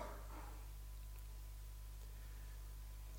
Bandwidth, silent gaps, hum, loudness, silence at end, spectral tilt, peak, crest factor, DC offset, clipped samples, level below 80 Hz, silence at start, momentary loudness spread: 17 kHz; none; 50 Hz at -50 dBFS; -55 LUFS; 0 s; -4.5 dB/octave; -38 dBFS; 14 dB; under 0.1%; under 0.1%; -52 dBFS; 0 s; 2 LU